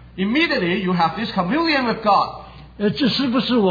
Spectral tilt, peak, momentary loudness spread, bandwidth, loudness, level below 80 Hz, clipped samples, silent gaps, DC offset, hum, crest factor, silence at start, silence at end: -7 dB/octave; -6 dBFS; 6 LU; 5 kHz; -19 LUFS; -48 dBFS; under 0.1%; none; under 0.1%; none; 14 dB; 0 s; 0 s